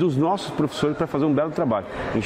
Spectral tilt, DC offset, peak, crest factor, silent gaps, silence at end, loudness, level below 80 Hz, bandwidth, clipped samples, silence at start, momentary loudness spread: -7 dB/octave; under 0.1%; -10 dBFS; 12 dB; none; 0 s; -23 LUFS; -50 dBFS; 14 kHz; under 0.1%; 0 s; 4 LU